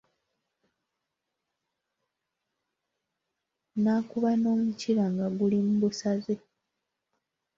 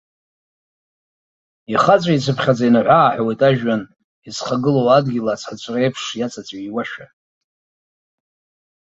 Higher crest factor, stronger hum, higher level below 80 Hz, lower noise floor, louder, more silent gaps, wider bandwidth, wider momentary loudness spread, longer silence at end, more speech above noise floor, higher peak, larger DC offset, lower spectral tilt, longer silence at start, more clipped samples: about the same, 16 dB vs 18 dB; neither; second, -72 dBFS vs -60 dBFS; second, -85 dBFS vs under -90 dBFS; second, -28 LUFS vs -17 LUFS; second, none vs 4.04-4.22 s; about the same, 7.6 kHz vs 8 kHz; second, 6 LU vs 13 LU; second, 1.2 s vs 1.85 s; second, 58 dB vs over 73 dB; second, -16 dBFS vs 0 dBFS; neither; about the same, -7 dB/octave vs -6 dB/octave; first, 3.75 s vs 1.7 s; neither